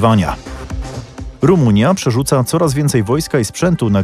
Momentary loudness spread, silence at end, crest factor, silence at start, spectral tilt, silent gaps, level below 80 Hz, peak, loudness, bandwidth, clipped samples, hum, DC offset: 15 LU; 0 s; 14 dB; 0 s; -6 dB/octave; none; -32 dBFS; 0 dBFS; -14 LUFS; 15 kHz; under 0.1%; none; under 0.1%